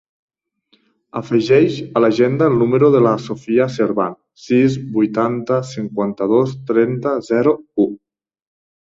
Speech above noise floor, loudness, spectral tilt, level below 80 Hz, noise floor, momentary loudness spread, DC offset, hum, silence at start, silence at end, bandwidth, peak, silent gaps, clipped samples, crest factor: 45 dB; -16 LUFS; -7.5 dB/octave; -58 dBFS; -61 dBFS; 9 LU; under 0.1%; none; 1.15 s; 1.05 s; 7.8 kHz; 0 dBFS; none; under 0.1%; 16 dB